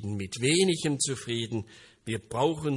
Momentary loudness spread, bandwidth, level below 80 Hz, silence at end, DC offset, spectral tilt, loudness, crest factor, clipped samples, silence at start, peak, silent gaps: 13 LU; 11.5 kHz; -64 dBFS; 0 s; under 0.1%; -4 dB/octave; -28 LUFS; 18 dB; under 0.1%; 0 s; -10 dBFS; none